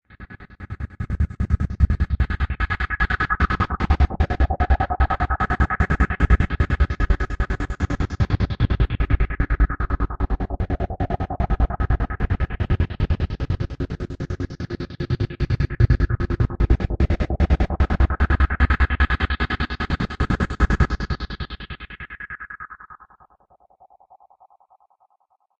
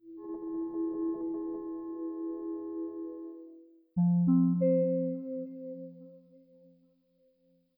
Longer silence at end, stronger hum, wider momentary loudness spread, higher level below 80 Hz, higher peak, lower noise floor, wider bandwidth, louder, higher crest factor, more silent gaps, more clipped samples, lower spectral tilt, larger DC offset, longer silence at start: first, 2.65 s vs 1.4 s; neither; second, 12 LU vs 19 LU; first, -24 dBFS vs -72 dBFS; first, -4 dBFS vs -18 dBFS; second, -65 dBFS vs -70 dBFS; first, 7.2 kHz vs 2.2 kHz; first, -23 LUFS vs -32 LUFS; about the same, 18 dB vs 16 dB; neither; neither; second, -7.5 dB/octave vs -15 dB/octave; neither; first, 0.2 s vs 0.05 s